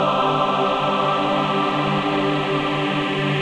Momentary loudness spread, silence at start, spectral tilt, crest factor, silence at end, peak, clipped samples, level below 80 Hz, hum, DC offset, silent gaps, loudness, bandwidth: 2 LU; 0 s; -6 dB/octave; 14 dB; 0 s; -6 dBFS; under 0.1%; -52 dBFS; none; under 0.1%; none; -20 LUFS; 10.5 kHz